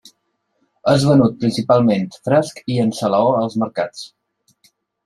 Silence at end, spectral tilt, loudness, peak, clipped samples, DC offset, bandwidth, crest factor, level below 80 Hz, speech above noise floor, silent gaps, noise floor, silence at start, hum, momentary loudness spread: 1 s; -6.5 dB/octave; -17 LUFS; -2 dBFS; under 0.1%; under 0.1%; 12.5 kHz; 16 dB; -54 dBFS; 53 dB; none; -69 dBFS; 0.85 s; none; 10 LU